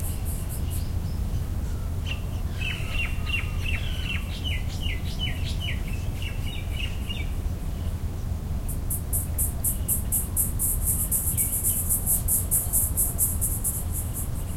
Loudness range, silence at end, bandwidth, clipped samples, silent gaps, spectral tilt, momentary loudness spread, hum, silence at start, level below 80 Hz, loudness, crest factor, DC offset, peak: 8 LU; 0 s; 16.5 kHz; under 0.1%; none; -3 dB/octave; 10 LU; none; 0 s; -32 dBFS; -27 LUFS; 20 dB; under 0.1%; -8 dBFS